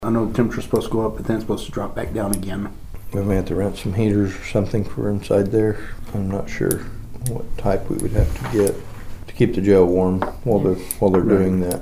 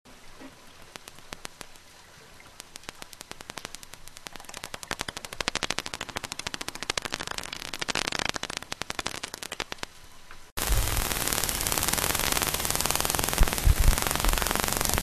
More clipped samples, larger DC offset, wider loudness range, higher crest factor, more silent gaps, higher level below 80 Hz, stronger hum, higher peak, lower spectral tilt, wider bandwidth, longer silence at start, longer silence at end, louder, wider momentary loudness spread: neither; neither; second, 5 LU vs 18 LU; second, 18 dB vs 30 dB; second, none vs 10.52-10.57 s; about the same, -32 dBFS vs -34 dBFS; neither; about the same, -2 dBFS vs 0 dBFS; first, -7 dB/octave vs -2 dB/octave; about the same, 15.5 kHz vs 14.5 kHz; about the same, 0 s vs 0.05 s; about the same, 0 s vs 0 s; first, -21 LUFS vs -28 LUFS; second, 12 LU vs 20 LU